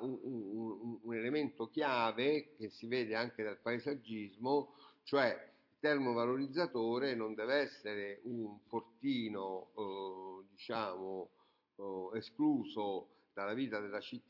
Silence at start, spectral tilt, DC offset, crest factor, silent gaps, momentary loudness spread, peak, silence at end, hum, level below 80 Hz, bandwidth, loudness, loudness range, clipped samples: 0 s; -7 dB/octave; under 0.1%; 20 dB; none; 12 LU; -20 dBFS; 0.1 s; none; -88 dBFS; 6 kHz; -39 LUFS; 6 LU; under 0.1%